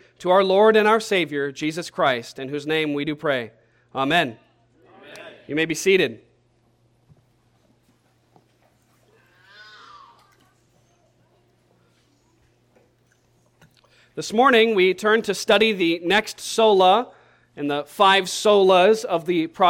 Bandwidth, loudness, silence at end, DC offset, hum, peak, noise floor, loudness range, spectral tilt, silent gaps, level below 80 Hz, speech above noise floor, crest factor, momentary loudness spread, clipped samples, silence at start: 16.5 kHz; -19 LUFS; 0 s; under 0.1%; none; -4 dBFS; -62 dBFS; 8 LU; -4 dB/octave; none; -64 dBFS; 43 dB; 18 dB; 14 LU; under 0.1%; 0.2 s